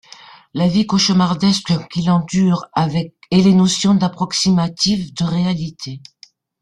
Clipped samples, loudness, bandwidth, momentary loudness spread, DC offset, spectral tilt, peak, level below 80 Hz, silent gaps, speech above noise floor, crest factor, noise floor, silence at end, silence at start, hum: under 0.1%; -16 LUFS; 10.5 kHz; 10 LU; under 0.1%; -5.5 dB/octave; -2 dBFS; -50 dBFS; none; 26 dB; 14 dB; -42 dBFS; 0.65 s; 0.55 s; none